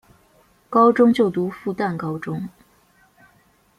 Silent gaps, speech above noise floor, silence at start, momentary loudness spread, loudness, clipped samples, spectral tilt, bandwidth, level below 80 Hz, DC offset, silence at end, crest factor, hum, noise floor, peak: none; 40 dB; 0.7 s; 15 LU; -20 LUFS; under 0.1%; -8 dB/octave; 12 kHz; -62 dBFS; under 0.1%; 1.3 s; 18 dB; none; -58 dBFS; -4 dBFS